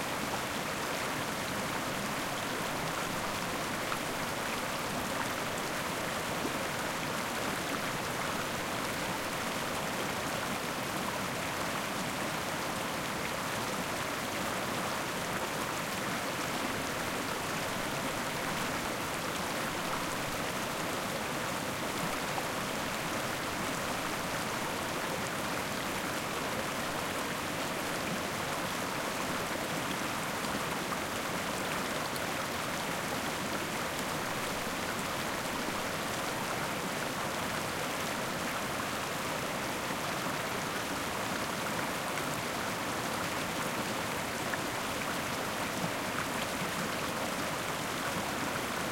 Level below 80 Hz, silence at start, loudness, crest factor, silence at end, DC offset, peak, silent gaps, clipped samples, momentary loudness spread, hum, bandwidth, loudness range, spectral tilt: -58 dBFS; 0 s; -34 LUFS; 16 dB; 0 s; under 0.1%; -18 dBFS; none; under 0.1%; 1 LU; none; 17 kHz; 0 LU; -3 dB/octave